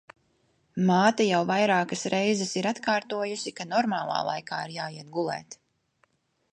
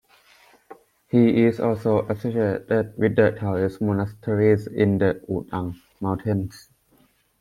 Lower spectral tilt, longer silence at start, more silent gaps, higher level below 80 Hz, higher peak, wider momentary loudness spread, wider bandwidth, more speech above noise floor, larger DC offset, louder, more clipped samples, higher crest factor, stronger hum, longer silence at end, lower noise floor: second, -4.5 dB/octave vs -9 dB/octave; about the same, 0.75 s vs 0.7 s; neither; second, -74 dBFS vs -56 dBFS; second, -8 dBFS vs -4 dBFS; first, 12 LU vs 9 LU; second, 10 kHz vs 14 kHz; first, 43 dB vs 39 dB; neither; second, -27 LUFS vs -22 LUFS; neither; about the same, 20 dB vs 18 dB; neither; first, 1 s vs 0.8 s; first, -70 dBFS vs -61 dBFS